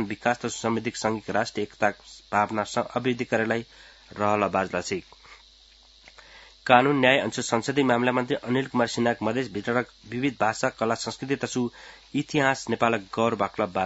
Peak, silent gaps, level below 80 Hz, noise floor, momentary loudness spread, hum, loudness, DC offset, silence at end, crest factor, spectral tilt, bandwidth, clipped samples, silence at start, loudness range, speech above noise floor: 0 dBFS; none; -62 dBFS; -55 dBFS; 10 LU; none; -25 LUFS; under 0.1%; 0 s; 26 dB; -4.5 dB/octave; 8 kHz; under 0.1%; 0 s; 5 LU; 29 dB